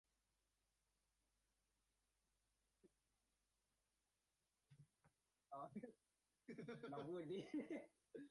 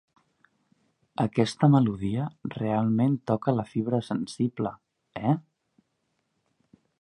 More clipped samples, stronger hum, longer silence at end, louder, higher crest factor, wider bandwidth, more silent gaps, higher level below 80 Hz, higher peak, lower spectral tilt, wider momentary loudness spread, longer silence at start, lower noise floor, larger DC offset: neither; neither; second, 0 s vs 1.6 s; second, -55 LUFS vs -27 LUFS; about the same, 20 dB vs 22 dB; about the same, 11 kHz vs 11 kHz; neither; second, under -90 dBFS vs -60 dBFS; second, -40 dBFS vs -6 dBFS; about the same, -7 dB/octave vs -8 dB/octave; about the same, 12 LU vs 12 LU; first, 2.85 s vs 1.2 s; first, under -90 dBFS vs -76 dBFS; neither